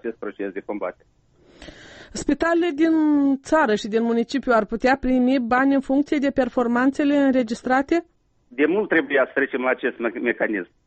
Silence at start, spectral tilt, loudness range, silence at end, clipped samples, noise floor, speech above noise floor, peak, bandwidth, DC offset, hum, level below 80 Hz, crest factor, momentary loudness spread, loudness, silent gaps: 0.05 s; -5 dB/octave; 3 LU; 0.25 s; under 0.1%; -45 dBFS; 24 dB; -8 dBFS; 8.4 kHz; under 0.1%; none; -48 dBFS; 14 dB; 10 LU; -21 LUFS; none